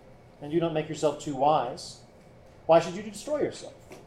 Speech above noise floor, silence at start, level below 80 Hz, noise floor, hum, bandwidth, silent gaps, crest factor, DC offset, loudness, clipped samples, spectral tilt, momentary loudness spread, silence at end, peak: 25 dB; 0.05 s; -60 dBFS; -53 dBFS; none; 13 kHz; none; 20 dB; under 0.1%; -27 LUFS; under 0.1%; -5.5 dB/octave; 20 LU; 0 s; -10 dBFS